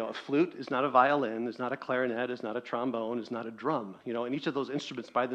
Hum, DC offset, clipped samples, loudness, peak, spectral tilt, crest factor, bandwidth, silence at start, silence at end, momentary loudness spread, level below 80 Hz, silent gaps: none; under 0.1%; under 0.1%; -31 LUFS; -8 dBFS; -6 dB/octave; 24 dB; 8.8 kHz; 0 s; 0 s; 10 LU; -78 dBFS; none